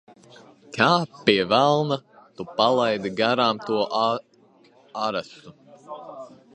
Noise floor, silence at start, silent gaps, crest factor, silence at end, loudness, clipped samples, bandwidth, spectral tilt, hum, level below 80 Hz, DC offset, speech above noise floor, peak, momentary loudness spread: -56 dBFS; 0.7 s; none; 22 dB; 0.25 s; -22 LUFS; under 0.1%; 9 kHz; -5 dB/octave; none; -66 dBFS; under 0.1%; 34 dB; -2 dBFS; 20 LU